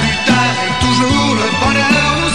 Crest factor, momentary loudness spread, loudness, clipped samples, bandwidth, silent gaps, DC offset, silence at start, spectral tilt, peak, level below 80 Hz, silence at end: 10 dB; 3 LU; -12 LUFS; under 0.1%; 12.5 kHz; none; 2%; 0 s; -4 dB/octave; -2 dBFS; -30 dBFS; 0 s